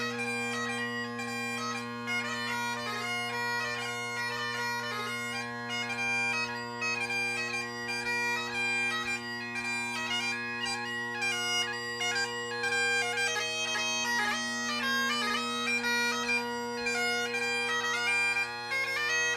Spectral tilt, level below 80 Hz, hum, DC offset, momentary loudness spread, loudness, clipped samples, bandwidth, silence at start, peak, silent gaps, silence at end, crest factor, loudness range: -1.5 dB/octave; -70 dBFS; none; under 0.1%; 6 LU; -30 LUFS; under 0.1%; 15.5 kHz; 0 s; -18 dBFS; none; 0 s; 14 dB; 4 LU